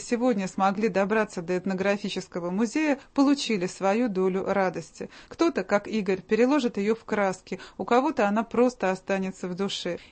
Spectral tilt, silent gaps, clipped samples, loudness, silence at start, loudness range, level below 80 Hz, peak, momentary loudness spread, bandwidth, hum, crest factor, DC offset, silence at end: -5.5 dB/octave; none; under 0.1%; -26 LUFS; 0 s; 1 LU; -62 dBFS; -10 dBFS; 8 LU; 8.8 kHz; none; 16 dB; under 0.1%; 0.05 s